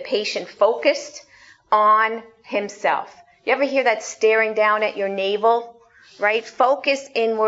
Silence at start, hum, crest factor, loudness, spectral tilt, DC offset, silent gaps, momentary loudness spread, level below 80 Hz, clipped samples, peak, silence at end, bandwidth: 0 s; none; 18 dB; -20 LUFS; -2.5 dB/octave; under 0.1%; none; 10 LU; -72 dBFS; under 0.1%; -2 dBFS; 0 s; 8 kHz